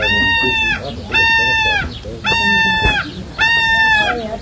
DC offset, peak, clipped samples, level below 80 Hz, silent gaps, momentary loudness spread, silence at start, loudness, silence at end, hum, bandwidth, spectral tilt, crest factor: under 0.1%; 0 dBFS; under 0.1%; -32 dBFS; none; 8 LU; 0 s; -13 LUFS; 0 s; none; 8 kHz; -3.5 dB/octave; 14 dB